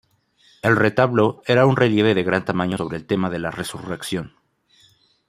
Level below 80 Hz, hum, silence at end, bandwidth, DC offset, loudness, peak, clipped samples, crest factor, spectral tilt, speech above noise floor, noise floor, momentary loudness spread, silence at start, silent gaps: -56 dBFS; none; 1 s; 15.5 kHz; under 0.1%; -20 LUFS; -2 dBFS; under 0.1%; 18 dB; -6.5 dB/octave; 39 dB; -58 dBFS; 12 LU; 0.65 s; none